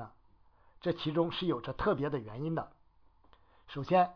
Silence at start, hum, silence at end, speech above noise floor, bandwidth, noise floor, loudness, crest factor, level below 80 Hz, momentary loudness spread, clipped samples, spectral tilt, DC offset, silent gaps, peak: 0 s; none; 0 s; 33 dB; 5.4 kHz; -66 dBFS; -34 LUFS; 20 dB; -56 dBFS; 13 LU; under 0.1%; -5 dB/octave; under 0.1%; none; -16 dBFS